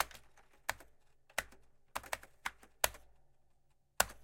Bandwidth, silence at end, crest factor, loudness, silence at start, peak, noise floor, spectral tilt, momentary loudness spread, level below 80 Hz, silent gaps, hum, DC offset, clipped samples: 17 kHz; 0 s; 36 dB; -41 LUFS; 0 s; -8 dBFS; -70 dBFS; 0 dB/octave; 20 LU; -62 dBFS; none; none; under 0.1%; under 0.1%